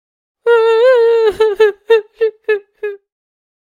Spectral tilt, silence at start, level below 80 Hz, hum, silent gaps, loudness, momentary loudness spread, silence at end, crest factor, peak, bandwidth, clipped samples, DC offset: -3 dB/octave; 0.45 s; -54 dBFS; none; none; -13 LUFS; 13 LU; 0.7 s; 14 dB; 0 dBFS; 10 kHz; under 0.1%; under 0.1%